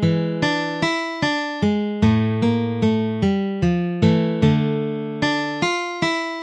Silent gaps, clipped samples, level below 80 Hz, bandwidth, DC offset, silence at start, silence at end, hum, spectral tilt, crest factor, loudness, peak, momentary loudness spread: none; under 0.1%; -44 dBFS; 9.4 kHz; under 0.1%; 0 s; 0 s; none; -6.5 dB/octave; 16 dB; -20 LUFS; -4 dBFS; 4 LU